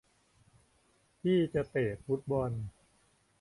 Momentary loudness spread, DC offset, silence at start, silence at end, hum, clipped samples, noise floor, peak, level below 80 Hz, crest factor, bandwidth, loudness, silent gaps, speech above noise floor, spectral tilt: 9 LU; under 0.1%; 1.25 s; 0.7 s; none; under 0.1%; -70 dBFS; -18 dBFS; -60 dBFS; 16 dB; 11.5 kHz; -33 LUFS; none; 38 dB; -8 dB/octave